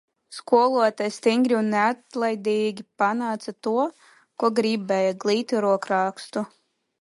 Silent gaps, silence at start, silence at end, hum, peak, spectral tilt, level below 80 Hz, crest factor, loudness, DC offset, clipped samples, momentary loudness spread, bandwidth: none; 0.3 s; 0.55 s; none; -6 dBFS; -5 dB/octave; -76 dBFS; 18 dB; -23 LUFS; under 0.1%; under 0.1%; 9 LU; 11.5 kHz